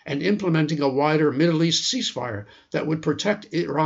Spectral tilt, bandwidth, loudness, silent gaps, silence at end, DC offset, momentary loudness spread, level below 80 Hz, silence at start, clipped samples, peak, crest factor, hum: -5 dB/octave; 8 kHz; -22 LUFS; none; 0 s; under 0.1%; 10 LU; -64 dBFS; 0.05 s; under 0.1%; -8 dBFS; 14 dB; none